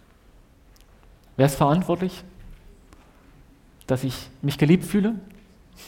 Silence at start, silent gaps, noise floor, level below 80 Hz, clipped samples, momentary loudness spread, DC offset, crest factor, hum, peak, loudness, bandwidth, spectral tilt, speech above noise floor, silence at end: 1.4 s; none; -53 dBFS; -50 dBFS; under 0.1%; 13 LU; under 0.1%; 20 dB; none; -6 dBFS; -23 LUFS; 17 kHz; -7 dB/octave; 31 dB; 0 s